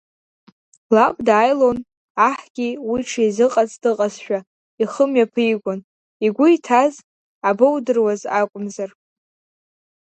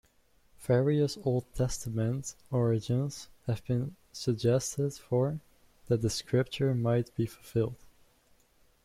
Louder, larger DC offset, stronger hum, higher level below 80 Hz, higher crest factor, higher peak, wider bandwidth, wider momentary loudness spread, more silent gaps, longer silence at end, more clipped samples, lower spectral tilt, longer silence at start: first, -18 LUFS vs -31 LUFS; neither; neither; second, -60 dBFS vs -54 dBFS; about the same, 18 dB vs 18 dB; first, -2 dBFS vs -14 dBFS; second, 8.8 kHz vs 15 kHz; first, 11 LU vs 8 LU; first, 1.97-2.15 s, 2.50-2.55 s, 4.47-4.78 s, 5.84-6.20 s, 7.04-7.41 s vs none; about the same, 1.2 s vs 1.1 s; neither; second, -5 dB/octave vs -6.5 dB/octave; first, 0.9 s vs 0.6 s